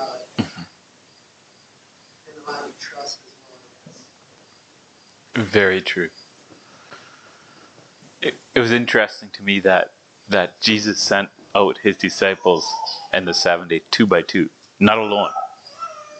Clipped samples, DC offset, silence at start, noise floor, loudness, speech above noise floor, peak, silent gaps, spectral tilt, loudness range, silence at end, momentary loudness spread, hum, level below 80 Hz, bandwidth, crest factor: under 0.1%; under 0.1%; 0 s; -50 dBFS; -17 LUFS; 33 dB; 0 dBFS; none; -4 dB/octave; 16 LU; 0 s; 14 LU; none; -60 dBFS; 9 kHz; 20 dB